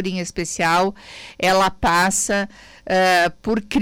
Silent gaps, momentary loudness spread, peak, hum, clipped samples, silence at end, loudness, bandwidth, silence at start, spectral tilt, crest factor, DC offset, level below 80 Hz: none; 9 LU; -10 dBFS; none; under 0.1%; 0 s; -19 LUFS; 17.5 kHz; 0 s; -3.5 dB/octave; 10 dB; under 0.1%; -44 dBFS